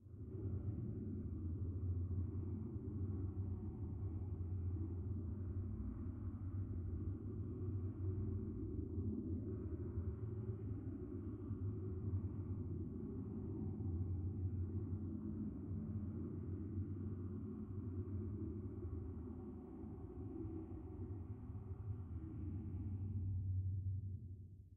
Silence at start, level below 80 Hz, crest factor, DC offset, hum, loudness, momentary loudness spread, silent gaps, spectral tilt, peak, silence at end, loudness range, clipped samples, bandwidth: 0 s; -56 dBFS; 12 dB; under 0.1%; none; -46 LUFS; 6 LU; none; -13 dB/octave; -32 dBFS; 0 s; 4 LU; under 0.1%; 2 kHz